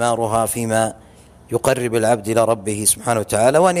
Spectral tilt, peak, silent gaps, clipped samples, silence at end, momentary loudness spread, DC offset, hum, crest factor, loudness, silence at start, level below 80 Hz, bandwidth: -4 dB/octave; -2 dBFS; none; under 0.1%; 0 s; 5 LU; under 0.1%; none; 16 dB; -18 LUFS; 0 s; -50 dBFS; 15.5 kHz